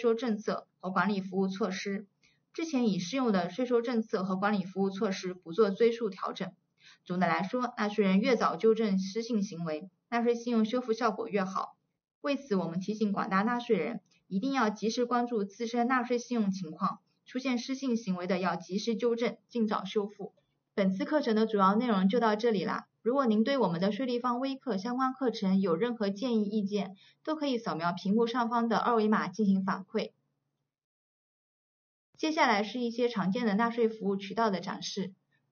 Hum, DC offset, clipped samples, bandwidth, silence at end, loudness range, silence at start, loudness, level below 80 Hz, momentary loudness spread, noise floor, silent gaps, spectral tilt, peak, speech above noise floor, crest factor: none; under 0.1%; under 0.1%; 6.8 kHz; 0.4 s; 3 LU; 0 s; -31 LUFS; -82 dBFS; 10 LU; -84 dBFS; 12.15-12.21 s, 30.84-32.13 s; -5 dB/octave; -12 dBFS; 54 dB; 18 dB